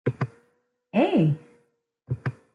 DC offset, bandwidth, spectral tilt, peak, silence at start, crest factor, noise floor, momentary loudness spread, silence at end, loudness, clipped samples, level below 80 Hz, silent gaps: under 0.1%; 7.2 kHz; -9 dB/octave; -10 dBFS; 0.05 s; 18 dB; -70 dBFS; 12 LU; 0.25 s; -26 LUFS; under 0.1%; -64 dBFS; none